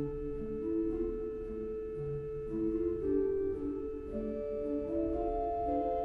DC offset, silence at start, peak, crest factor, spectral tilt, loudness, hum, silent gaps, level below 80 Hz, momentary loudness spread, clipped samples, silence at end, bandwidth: under 0.1%; 0 s; -22 dBFS; 14 dB; -10.5 dB/octave; -36 LUFS; none; none; -48 dBFS; 7 LU; under 0.1%; 0 s; 4.4 kHz